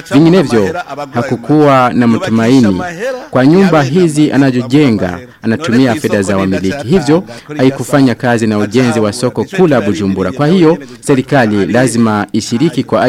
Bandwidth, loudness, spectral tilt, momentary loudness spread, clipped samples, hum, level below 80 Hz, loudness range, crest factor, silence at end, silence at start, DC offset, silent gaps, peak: 15 kHz; -11 LUFS; -6.5 dB/octave; 8 LU; under 0.1%; none; -44 dBFS; 2 LU; 10 dB; 0 s; 0.05 s; under 0.1%; none; 0 dBFS